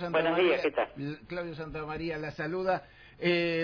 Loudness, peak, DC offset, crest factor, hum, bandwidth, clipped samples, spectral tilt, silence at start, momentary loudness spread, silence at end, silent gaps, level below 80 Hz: -31 LUFS; -16 dBFS; under 0.1%; 16 dB; none; 5.4 kHz; under 0.1%; -7 dB/octave; 0 s; 12 LU; 0 s; none; -58 dBFS